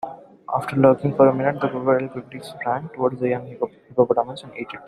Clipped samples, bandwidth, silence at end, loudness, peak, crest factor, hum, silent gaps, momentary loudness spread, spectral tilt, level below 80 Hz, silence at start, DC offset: under 0.1%; 12 kHz; 0 s; -21 LUFS; -2 dBFS; 20 dB; none; none; 16 LU; -8 dB/octave; -62 dBFS; 0.05 s; under 0.1%